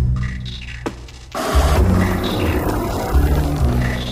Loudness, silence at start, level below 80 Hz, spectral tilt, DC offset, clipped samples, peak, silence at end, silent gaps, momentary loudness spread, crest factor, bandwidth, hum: -19 LUFS; 0 s; -22 dBFS; -6 dB/octave; under 0.1%; under 0.1%; -4 dBFS; 0 s; none; 13 LU; 14 dB; 16 kHz; none